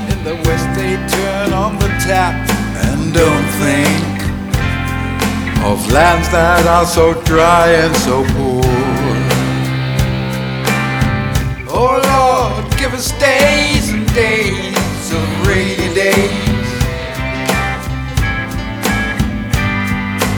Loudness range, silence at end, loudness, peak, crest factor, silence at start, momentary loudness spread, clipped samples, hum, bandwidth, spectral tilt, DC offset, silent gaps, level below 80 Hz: 5 LU; 0 s; -14 LUFS; 0 dBFS; 14 dB; 0 s; 8 LU; under 0.1%; none; over 20 kHz; -5 dB/octave; under 0.1%; none; -24 dBFS